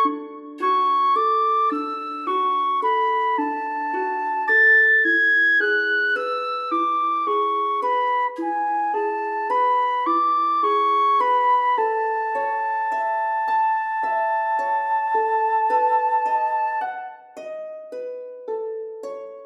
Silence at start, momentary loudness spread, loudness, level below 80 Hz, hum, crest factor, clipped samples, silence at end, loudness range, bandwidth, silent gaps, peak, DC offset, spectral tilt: 0 s; 15 LU; -20 LUFS; -90 dBFS; none; 12 dB; under 0.1%; 0 s; 5 LU; 11.5 kHz; none; -8 dBFS; under 0.1%; -2.5 dB/octave